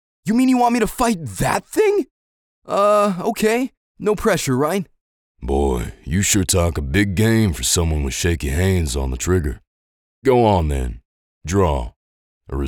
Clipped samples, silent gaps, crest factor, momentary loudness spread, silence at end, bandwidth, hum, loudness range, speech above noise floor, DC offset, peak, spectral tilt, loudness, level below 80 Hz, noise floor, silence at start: under 0.1%; 2.11-2.62 s, 3.77-3.95 s, 5.01-5.35 s, 9.67-10.22 s, 11.05-11.41 s, 11.96-12.41 s; 16 dB; 10 LU; 0 s; 19.5 kHz; none; 2 LU; over 72 dB; under 0.1%; -2 dBFS; -5 dB/octave; -19 LUFS; -32 dBFS; under -90 dBFS; 0.25 s